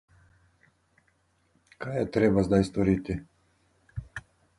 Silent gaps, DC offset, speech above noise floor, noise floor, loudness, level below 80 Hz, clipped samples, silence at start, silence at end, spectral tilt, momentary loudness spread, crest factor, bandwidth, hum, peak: none; under 0.1%; 44 dB; -69 dBFS; -26 LUFS; -50 dBFS; under 0.1%; 1.8 s; 0.4 s; -8 dB/octave; 19 LU; 20 dB; 11.5 kHz; none; -10 dBFS